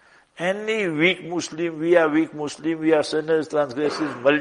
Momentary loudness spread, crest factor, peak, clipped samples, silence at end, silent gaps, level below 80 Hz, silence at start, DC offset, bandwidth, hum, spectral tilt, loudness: 9 LU; 20 dB; -2 dBFS; under 0.1%; 0 s; none; -68 dBFS; 0.4 s; under 0.1%; 11 kHz; none; -5 dB/octave; -22 LUFS